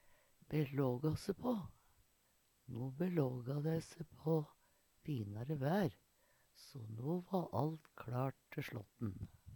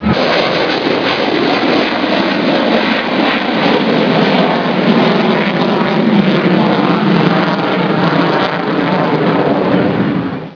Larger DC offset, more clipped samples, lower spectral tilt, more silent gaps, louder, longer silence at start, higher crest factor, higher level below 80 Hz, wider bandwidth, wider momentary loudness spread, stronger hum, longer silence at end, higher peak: neither; neither; about the same, -8 dB/octave vs -7 dB/octave; neither; second, -42 LUFS vs -12 LUFS; first, 0.5 s vs 0 s; first, 20 dB vs 12 dB; second, -70 dBFS vs -46 dBFS; first, 19 kHz vs 5.4 kHz; first, 14 LU vs 3 LU; neither; about the same, 0 s vs 0 s; second, -22 dBFS vs 0 dBFS